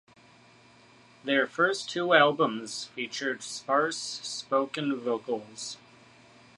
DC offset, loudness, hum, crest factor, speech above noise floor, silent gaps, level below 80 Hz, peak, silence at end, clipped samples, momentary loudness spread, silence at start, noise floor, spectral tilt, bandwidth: under 0.1%; -28 LUFS; none; 24 dB; 29 dB; none; -80 dBFS; -6 dBFS; 0.8 s; under 0.1%; 14 LU; 1.25 s; -57 dBFS; -3 dB/octave; 11.5 kHz